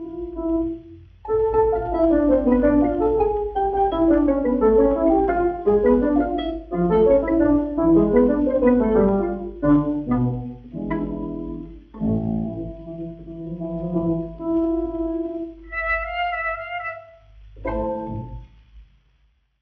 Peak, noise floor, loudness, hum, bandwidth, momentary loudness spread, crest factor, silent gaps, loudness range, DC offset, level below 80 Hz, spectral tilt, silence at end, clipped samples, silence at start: -6 dBFS; -62 dBFS; -21 LUFS; none; 4.5 kHz; 15 LU; 16 dB; none; 9 LU; under 0.1%; -38 dBFS; -11 dB/octave; 0.8 s; under 0.1%; 0 s